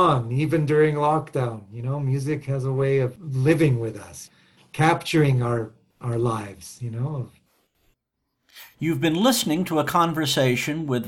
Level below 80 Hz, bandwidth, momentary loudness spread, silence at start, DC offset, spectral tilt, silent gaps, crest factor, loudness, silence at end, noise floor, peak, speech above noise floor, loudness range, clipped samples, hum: -56 dBFS; 17 kHz; 14 LU; 0 s; under 0.1%; -6 dB/octave; none; 18 dB; -23 LUFS; 0 s; -78 dBFS; -6 dBFS; 55 dB; 6 LU; under 0.1%; none